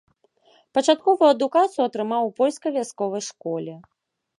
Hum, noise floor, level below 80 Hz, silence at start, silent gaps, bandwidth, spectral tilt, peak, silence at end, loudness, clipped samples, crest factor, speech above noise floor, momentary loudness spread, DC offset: none; -60 dBFS; -78 dBFS; 0.75 s; none; 11.5 kHz; -4 dB/octave; -4 dBFS; 0.55 s; -22 LUFS; under 0.1%; 18 dB; 38 dB; 12 LU; under 0.1%